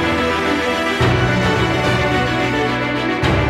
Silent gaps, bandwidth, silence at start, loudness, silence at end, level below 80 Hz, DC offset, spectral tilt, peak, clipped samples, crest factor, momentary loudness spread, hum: none; 15 kHz; 0 s; -17 LUFS; 0 s; -32 dBFS; under 0.1%; -5.5 dB/octave; -4 dBFS; under 0.1%; 14 dB; 2 LU; none